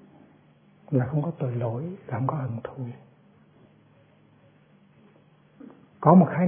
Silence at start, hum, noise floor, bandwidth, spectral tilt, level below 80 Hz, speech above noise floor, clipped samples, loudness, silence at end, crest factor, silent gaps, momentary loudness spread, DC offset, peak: 0.9 s; none; -58 dBFS; 3.4 kHz; -13.5 dB/octave; -66 dBFS; 35 dB; under 0.1%; -25 LUFS; 0 s; 26 dB; none; 19 LU; under 0.1%; -2 dBFS